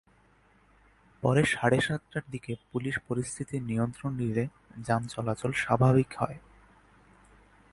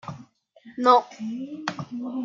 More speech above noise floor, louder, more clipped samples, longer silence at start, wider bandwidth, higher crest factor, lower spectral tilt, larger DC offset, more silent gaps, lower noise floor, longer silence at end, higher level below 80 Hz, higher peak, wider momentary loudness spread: first, 34 dB vs 28 dB; second, -29 LUFS vs -24 LUFS; neither; first, 1.2 s vs 0.05 s; first, 11.5 kHz vs 7.6 kHz; about the same, 22 dB vs 22 dB; about the same, -6 dB/octave vs -5.5 dB/octave; neither; neither; first, -63 dBFS vs -52 dBFS; first, 1.35 s vs 0 s; first, -58 dBFS vs -76 dBFS; second, -8 dBFS vs -4 dBFS; second, 12 LU vs 22 LU